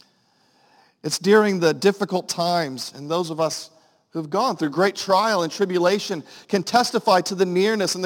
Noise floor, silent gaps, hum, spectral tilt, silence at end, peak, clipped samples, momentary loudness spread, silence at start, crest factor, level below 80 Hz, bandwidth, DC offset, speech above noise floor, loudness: -62 dBFS; none; none; -4 dB/octave; 0 s; -4 dBFS; under 0.1%; 12 LU; 1.05 s; 18 dB; -72 dBFS; 17 kHz; under 0.1%; 41 dB; -21 LUFS